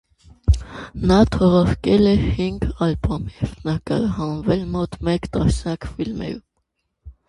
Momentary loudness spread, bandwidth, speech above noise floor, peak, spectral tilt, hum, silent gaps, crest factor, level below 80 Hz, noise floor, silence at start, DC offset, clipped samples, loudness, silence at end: 12 LU; 11.5 kHz; 54 dB; -2 dBFS; -7.5 dB/octave; none; none; 18 dB; -30 dBFS; -73 dBFS; 0.45 s; under 0.1%; under 0.1%; -20 LUFS; 0.2 s